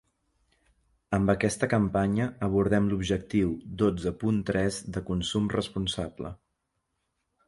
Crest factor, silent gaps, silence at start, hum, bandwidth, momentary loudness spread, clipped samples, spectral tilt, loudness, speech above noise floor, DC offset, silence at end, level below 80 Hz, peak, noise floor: 20 dB; none; 1.1 s; none; 11.5 kHz; 7 LU; under 0.1%; -6 dB/octave; -28 LUFS; 52 dB; under 0.1%; 1.1 s; -48 dBFS; -8 dBFS; -79 dBFS